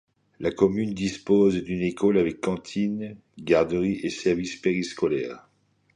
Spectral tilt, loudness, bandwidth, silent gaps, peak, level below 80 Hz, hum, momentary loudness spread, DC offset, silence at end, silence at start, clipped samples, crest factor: -6.5 dB/octave; -25 LUFS; 10.5 kHz; none; -6 dBFS; -54 dBFS; none; 10 LU; under 0.1%; 0.55 s; 0.4 s; under 0.1%; 20 dB